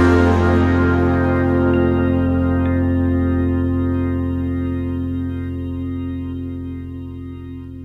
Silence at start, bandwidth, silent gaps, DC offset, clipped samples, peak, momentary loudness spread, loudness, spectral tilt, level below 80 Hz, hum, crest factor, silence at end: 0 s; 7 kHz; none; under 0.1%; under 0.1%; -4 dBFS; 14 LU; -18 LUFS; -9 dB/octave; -32 dBFS; none; 14 dB; 0 s